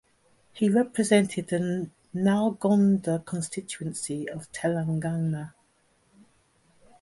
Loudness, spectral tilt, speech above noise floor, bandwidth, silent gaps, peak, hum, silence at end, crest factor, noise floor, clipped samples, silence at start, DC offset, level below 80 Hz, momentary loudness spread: -27 LUFS; -6 dB/octave; 41 dB; 11.5 kHz; none; -6 dBFS; none; 1.5 s; 20 dB; -66 dBFS; under 0.1%; 0.55 s; under 0.1%; -64 dBFS; 12 LU